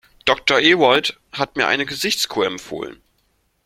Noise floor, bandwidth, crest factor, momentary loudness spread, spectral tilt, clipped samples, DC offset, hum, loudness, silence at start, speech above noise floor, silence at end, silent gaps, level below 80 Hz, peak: -65 dBFS; 16.5 kHz; 20 dB; 16 LU; -2.5 dB/octave; under 0.1%; under 0.1%; none; -17 LUFS; 0.25 s; 46 dB; 0.7 s; none; -56 dBFS; 0 dBFS